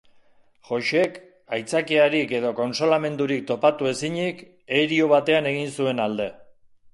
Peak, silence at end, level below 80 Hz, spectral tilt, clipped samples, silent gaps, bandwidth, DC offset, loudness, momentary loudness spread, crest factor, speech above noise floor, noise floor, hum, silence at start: -4 dBFS; 0.5 s; -68 dBFS; -5 dB/octave; under 0.1%; none; 11.5 kHz; under 0.1%; -23 LUFS; 11 LU; 18 dB; 33 dB; -55 dBFS; none; 0.7 s